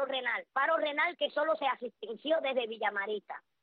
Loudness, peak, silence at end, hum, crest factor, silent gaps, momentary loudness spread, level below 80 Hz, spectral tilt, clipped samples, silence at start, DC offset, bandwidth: -32 LUFS; -18 dBFS; 0.25 s; none; 16 dB; none; 10 LU; -86 dBFS; -5.5 dB/octave; under 0.1%; 0 s; under 0.1%; 4.8 kHz